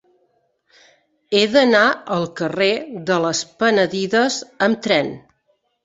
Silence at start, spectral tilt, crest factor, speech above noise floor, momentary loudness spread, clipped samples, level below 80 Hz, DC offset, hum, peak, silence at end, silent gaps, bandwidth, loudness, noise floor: 1.3 s; -4 dB/octave; 18 dB; 48 dB; 9 LU; under 0.1%; -62 dBFS; under 0.1%; none; -2 dBFS; 0.65 s; none; 8 kHz; -18 LUFS; -66 dBFS